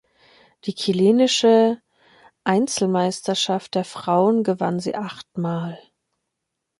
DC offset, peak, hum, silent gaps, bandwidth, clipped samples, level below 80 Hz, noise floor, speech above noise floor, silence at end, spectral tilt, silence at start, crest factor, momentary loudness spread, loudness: under 0.1%; -4 dBFS; none; none; 11.5 kHz; under 0.1%; -68 dBFS; -80 dBFS; 60 dB; 1 s; -5 dB/octave; 0.65 s; 18 dB; 14 LU; -21 LUFS